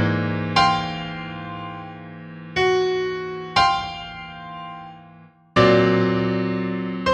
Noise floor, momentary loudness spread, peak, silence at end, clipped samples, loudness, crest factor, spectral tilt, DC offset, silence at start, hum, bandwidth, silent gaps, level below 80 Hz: -48 dBFS; 19 LU; 0 dBFS; 0 s; under 0.1%; -21 LUFS; 22 dB; -6 dB/octave; under 0.1%; 0 s; none; 9.8 kHz; none; -48 dBFS